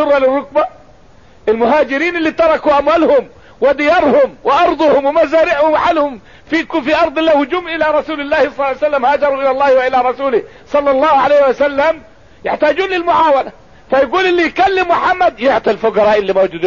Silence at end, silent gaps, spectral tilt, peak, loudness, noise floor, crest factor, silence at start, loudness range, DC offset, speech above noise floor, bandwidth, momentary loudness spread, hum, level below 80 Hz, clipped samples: 0 s; none; -5 dB/octave; -2 dBFS; -13 LUFS; -44 dBFS; 10 dB; 0 s; 2 LU; 0.5%; 32 dB; 7.2 kHz; 6 LU; none; -44 dBFS; under 0.1%